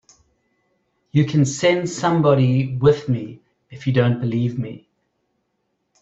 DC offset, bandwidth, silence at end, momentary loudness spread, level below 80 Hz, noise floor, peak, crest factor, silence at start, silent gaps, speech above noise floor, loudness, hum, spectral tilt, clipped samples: under 0.1%; 8 kHz; 1.25 s; 10 LU; -54 dBFS; -72 dBFS; -2 dBFS; 18 dB; 1.15 s; none; 54 dB; -19 LUFS; none; -6.5 dB/octave; under 0.1%